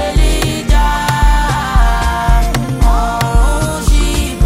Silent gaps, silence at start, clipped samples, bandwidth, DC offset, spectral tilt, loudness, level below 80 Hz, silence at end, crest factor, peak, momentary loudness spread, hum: none; 0 s; under 0.1%; 15.5 kHz; under 0.1%; -5 dB/octave; -14 LUFS; -12 dBFS; 0 s; 10 dB; 0 dBFS; 2 LU; none